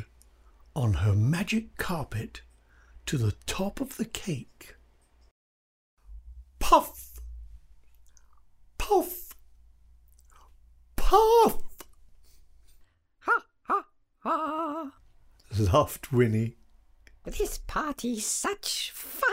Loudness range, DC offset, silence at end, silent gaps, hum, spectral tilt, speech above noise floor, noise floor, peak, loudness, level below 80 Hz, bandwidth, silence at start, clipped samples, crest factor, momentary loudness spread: 8 LU; under 0.1%; 0 s; 5.31-5.97 s; none; -5 dB/octave; 34 dB; -60 dBFS; -6 dBFS; -28 LUFS; -42 dBFS; 16 kHz; 0 s; under 0.1%; 22 dB; 22 LU